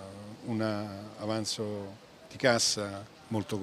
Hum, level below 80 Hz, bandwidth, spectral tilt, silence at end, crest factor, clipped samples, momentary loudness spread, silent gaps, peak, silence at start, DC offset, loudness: none; -70 dBFS; 15.5 kHz; -3.5 dB/octave; 0 s; 24 dB; under 0.1%; 19 LU; none; -10 dBFS; 0 s; under 0.1%; -32 LUFS